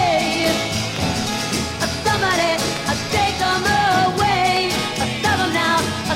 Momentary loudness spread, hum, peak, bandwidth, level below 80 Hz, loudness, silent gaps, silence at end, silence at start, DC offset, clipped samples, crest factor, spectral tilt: 5 LU; none; -4 dBFS; 16.5 kHz; -40 dBFS; -18 LUFS; none; 0 s; 0 s; under 0.1%; under 0.1%; 14 dB; -3.5 dB/octave